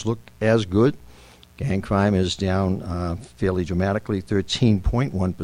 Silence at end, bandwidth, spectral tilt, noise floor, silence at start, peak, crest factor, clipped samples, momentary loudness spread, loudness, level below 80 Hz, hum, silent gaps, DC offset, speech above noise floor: 0 s; 11 kHz; -6.5 dB/octave; -48 dBFS; 0 s; -6 dBFS; 16 dB; under 0.1%; 7 LU; -23 LUFS; -36 dBFS; none; none; under 0.1%; 26 dB